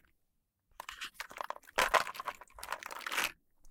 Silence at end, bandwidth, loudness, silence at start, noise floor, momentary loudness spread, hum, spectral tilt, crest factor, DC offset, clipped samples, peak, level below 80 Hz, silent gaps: 0 s; 18 kHz; -36 LUFS; 0.8 s; -80 dBFS; 16 LU; none; 0 dB/octave; 30 dB; under 0.1%; under 0.1%; -10 dBFS; -64 dBFS; none